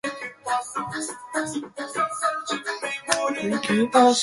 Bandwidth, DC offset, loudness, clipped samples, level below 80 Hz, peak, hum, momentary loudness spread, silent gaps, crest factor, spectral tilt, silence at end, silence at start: 11.5 kHz; under 0.1%; -25 LUFS; under 0.1%; -66 dBFS; -2 dBFS; none; 11 LU; none; 22 dB; -3 dB/octave; 0 s; 0.05 s